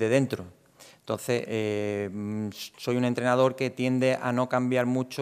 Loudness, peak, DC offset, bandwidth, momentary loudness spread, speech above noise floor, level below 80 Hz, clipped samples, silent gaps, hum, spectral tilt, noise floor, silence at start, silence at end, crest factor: -27 LUFS; -8 dBFS; under 0.1%; 15.5 kHz; 10 LU; 28 dB; -76 dBFS; under 0.1%; none; none; -6 dB/octave; -54 dBFS; 0 s; 0 s; 18 dB